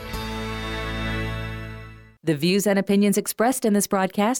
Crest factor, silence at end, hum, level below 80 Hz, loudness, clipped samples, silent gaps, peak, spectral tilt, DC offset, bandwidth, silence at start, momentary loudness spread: 12 dB; 0 s; none; -40 dBFS; -23 LUFS; under 0.1%; none; -10 dBFS; -5 dB/octave; under 0.1%; 17.5 kHz; 0 s; 12 LU